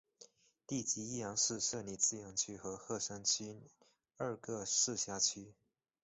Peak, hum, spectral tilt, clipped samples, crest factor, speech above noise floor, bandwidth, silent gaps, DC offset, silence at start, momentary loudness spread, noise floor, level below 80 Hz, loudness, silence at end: -18 dBFS; none; -2 dB/octave; under 0.1%; 24 dB; 25 dB; 8.2 kHz; none; under 0.1%; 0.2 s; 10 LU; -65 dBFS; -74 dBFS; -37 LUFS; 0.5 s